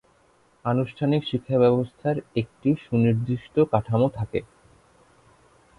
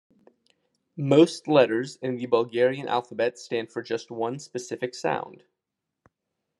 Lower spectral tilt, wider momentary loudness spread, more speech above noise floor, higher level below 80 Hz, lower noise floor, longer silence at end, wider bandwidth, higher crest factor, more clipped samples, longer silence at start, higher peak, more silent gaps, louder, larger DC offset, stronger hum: first, -9.5 dB/octave vs -6 dB/octave; second, 9 LU vs 13 LU; second, 38 dB vs 60 dB; first, -54 dBFS vs -78 dBFS; second, -61 dBFS vs -85 dBFS; about the same, 1.35 s vs 1.25 s; about the same, 10.5 kHz vs 11.5 kHz; about the same, 20 dB vs 22 dB; neither; second, 0.65 s vs 0.95 s; about the same, -4 dBFS vs -4 dBFS; neither; about the same, -24 LUFS vs -25 LUFS; neither; neither